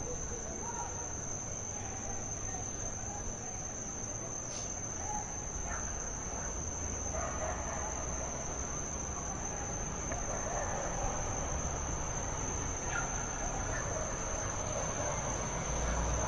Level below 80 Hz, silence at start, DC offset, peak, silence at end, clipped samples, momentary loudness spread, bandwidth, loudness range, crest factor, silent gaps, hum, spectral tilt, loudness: -44 dBFS; 0 s; under 0.1%; -22 dBFS; 0 s; under 0.1%; 4 LU; 11.5 kHz; 3 LU; 16 dB; none; none; -3.5 dB/octave; -37 LUFS